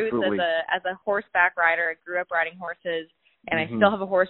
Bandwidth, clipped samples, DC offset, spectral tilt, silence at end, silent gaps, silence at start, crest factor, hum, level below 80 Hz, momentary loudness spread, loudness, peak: 4.2 kHz; under 0.1%; under 0.1%; -2 dB/octave; 0 s; none; 0 s; 22 dB; none; -64 dBFS; 10 LU; -24 LUFS; -4 dBFS